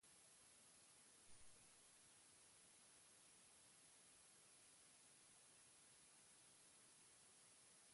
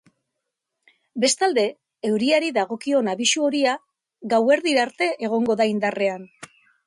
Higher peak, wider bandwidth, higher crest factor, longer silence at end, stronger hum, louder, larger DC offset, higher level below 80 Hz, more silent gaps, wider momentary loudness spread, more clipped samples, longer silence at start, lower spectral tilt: second, -52 dBFS vs -6 dBFS; about the same, 11.5 kHz vs 11.5 kHz; about the same, 18 dB vs 16 dB; second, 0 s vs 0.4 s; neither; second, -68 LUFS vs -21 LUFS; neither; second, under -90 dBFS vs -72 dBFS; neither; second, 0 LU vs 8 LU; neither; second, 0 s vs 1.15 s; second, -0.5 dB/octave vs -3 dB/octave